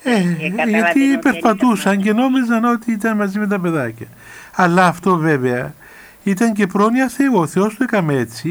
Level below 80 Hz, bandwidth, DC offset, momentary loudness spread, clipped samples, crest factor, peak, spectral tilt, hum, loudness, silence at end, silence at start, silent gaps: -58 dBFS; over 20 kHz; under 0.1%; 8 LU; under 0.1%; 14 dB; -2 dBFS; -6 dB/octave; none; -16 LUFS; 0 s; 0.05 s; none